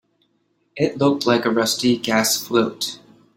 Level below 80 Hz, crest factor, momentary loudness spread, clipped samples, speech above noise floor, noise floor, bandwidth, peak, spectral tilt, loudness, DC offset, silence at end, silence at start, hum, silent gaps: -62 dBFS; 18 dB; 9 LU; under 0.1%; 47 dB; -67 dBFS; 16.5 kHz; -4 dBFS; -3.5 dB/octave; -19 LUFS; under 0.1%; 0.4 s; 0.75 s; none; none